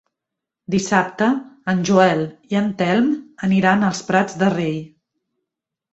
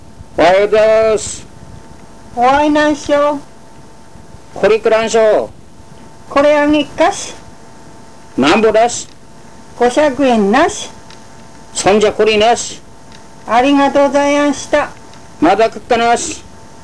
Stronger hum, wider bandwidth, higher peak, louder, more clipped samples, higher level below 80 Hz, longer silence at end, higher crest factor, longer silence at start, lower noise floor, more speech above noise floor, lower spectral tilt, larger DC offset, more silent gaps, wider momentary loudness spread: neither; second, 8.2 kHz vs 11 kHz; about the same, -2 dBFS vs -2 dBFS; second, -19 LUFS vs -12 LUFS; neither; second, -58 dBFS vs -42 dBFS; first, 1.05 s vs 0.45 s; first, 18 dB vs 10 dB; first, 0.7 s vs 0.2 s; first, -84 dBFS vs -39 dBFS; first, 66 dB vs 28 dB; first, -6 dB/octave vs -3.5 dB/octave; second, under 0.1% vs 2%; neither; second, 8 LU vs 15 LU